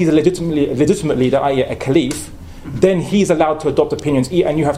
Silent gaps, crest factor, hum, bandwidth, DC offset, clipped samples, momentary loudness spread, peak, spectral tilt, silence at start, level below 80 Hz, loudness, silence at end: none; 16 dB; none; 15.5 kHz; under 0.1%; under 0.1%; 7 LU; 0 dBFS; -6.5 dB/octave; 0 s; -40 dBFS; -16 LUFS; 0 s